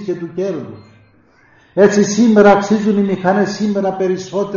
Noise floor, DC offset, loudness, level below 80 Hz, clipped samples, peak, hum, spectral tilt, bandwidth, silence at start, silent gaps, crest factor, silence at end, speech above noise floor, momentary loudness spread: -50 dBFS; under 0.1%; -14 LUFS; -54 dBFS; under 0.1%; 0 dBFS; none; -6 dB/octave; 7.4 kHz; 0 s; none; 14 dB; 0 s; 37 dB; 13 LU